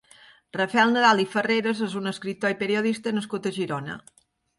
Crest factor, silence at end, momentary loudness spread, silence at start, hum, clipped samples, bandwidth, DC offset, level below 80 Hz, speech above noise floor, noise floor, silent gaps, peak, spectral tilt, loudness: 20 dB; 0.6 s; 12 LU; 0.55 s; none; under 0.1%; 11.5 kHz; under 0.1%; -70 dBFS; 30 dB; -54 dBFS; none; -4 dBFS; -5 dB/octave; -24 LUFS